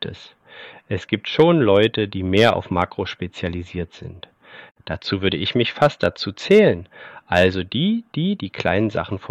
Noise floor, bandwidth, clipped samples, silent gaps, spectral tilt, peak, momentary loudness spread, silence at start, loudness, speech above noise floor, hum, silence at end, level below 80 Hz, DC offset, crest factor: -42 dBFS; 11.5 kHz; under 0.1%; none; -6.5 dB/octave; -4 dBFS; 17 LU; 0 s; -20 LUFS; 23 dB; none; 0 s; -50 dBFS; under 0.1%; 18 dB